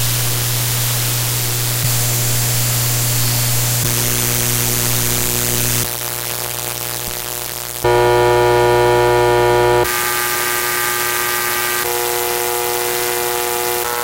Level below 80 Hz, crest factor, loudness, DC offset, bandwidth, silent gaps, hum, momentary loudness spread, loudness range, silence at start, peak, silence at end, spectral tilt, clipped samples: -38 dBFS; 16 dB; -15 LUFS; under 0.1%; 16.5 kHz; none; 60 Hz at -25 dBFS; 7 LU; 3 LU; 0 s; -2 dBFS; 0 s; -3 dB/octave; under 0.1%